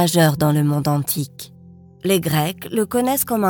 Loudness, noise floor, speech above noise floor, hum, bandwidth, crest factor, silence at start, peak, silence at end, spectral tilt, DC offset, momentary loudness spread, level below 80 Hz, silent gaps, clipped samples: -19 LUFS; -44 dBFS; 26 dB; none; 19.5 kHz; 18 dB; 0 s; -2 dBFS; 0 s; -5.5 dB/octave; under 0.1%; 12 LU; -52 dBFS; none; under 0.1%